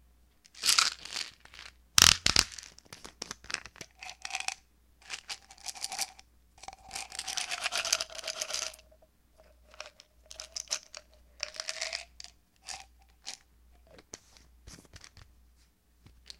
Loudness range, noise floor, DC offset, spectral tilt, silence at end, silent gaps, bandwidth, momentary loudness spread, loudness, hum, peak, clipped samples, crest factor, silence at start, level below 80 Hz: 21 LU; -65 dBFS; under 0.1%; 0.5 dB/octave; 1.2 s; none; 16.5 kHz; 25 LU; -30 LUFS; none; 0 dBFS; under 0.1%; 36 dB; 0.55 s; -56 dBFS